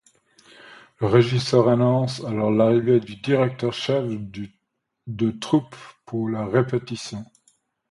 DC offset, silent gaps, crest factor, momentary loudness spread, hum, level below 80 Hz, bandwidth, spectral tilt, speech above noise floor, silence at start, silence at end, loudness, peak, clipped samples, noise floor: under 0.1%; none; 20 dB; 17 LU; none; -58 dBFS; 11.5 kHz; -7 dB/octave; 56 dB; 0.65 s; 0.7 s; -22 LUFS; -2 dBFS; under 0.1%; -77 dBFS